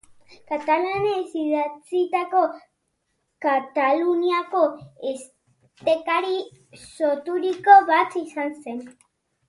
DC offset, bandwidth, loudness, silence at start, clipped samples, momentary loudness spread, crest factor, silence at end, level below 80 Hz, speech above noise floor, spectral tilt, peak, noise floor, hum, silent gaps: under 0.1%; 11.5 kHz; -22 LUFS; 0.5 s; under 0.1%; 13 LU; 22 dB; 0.6 s; -68 dBFS; 52 dB; -4.5 dB/octave; -2 dBFS; -74 dBFS; none; none